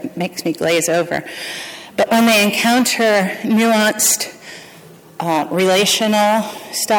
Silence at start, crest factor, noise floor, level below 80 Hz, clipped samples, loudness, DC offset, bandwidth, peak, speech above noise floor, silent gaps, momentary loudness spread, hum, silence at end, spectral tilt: 0 s; 12 dB; -41 dBFS; -60 dBFS; under 0.1%; -15 LUFS; under 0.1%; 19.5 kHz; -4 dBFS; 26 dB; none; 13 LU; none; 0 s; -3 dB/octave